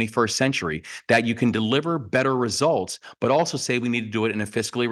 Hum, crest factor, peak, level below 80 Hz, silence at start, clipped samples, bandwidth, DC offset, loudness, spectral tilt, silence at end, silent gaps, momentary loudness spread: none; 18 dB; -4 dBFS; -60 dBFS; 0 s; under 0.1%; 12.5 kHz; under 0.1%; -23 LUFS; -4.5 dB/octave; 0 s; none; 5 LU